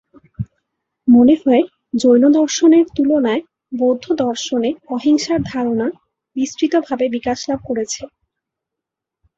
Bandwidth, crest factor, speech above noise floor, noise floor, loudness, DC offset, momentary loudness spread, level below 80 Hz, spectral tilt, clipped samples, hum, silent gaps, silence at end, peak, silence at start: 8 kHz; 14 dB; 68 dB; -83 dBFS; -16 LUFS; under 0.1%; 13 LU; -52 dBFS; -5 dB/octave; under 0.1%; none; none; 1.3 s; -2 dBFS; 0.4 s